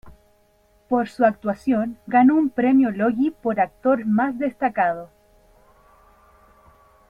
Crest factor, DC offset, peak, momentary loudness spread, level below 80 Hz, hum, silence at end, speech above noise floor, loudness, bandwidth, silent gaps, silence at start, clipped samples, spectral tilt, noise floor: 18 dB; under 0.1%; -4 dBFS; 7 LU; -58 dBFS; none; 2.05 s; 40 dB; -21 LUFS; 5.4 kHz; none; 0.05 s; under 0.1%; -8.5 dB/octave; -59 dBFS